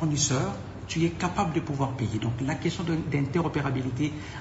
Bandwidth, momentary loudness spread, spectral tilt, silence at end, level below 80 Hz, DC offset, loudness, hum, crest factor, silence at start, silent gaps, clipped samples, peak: 8 kHz; 5 LU; -5 dB/octave; 0 s; -48 dBFS; under 0.1%; -28 LUFS; none; 16 dB; 0 s; none; under 0.1%; -12 dBFS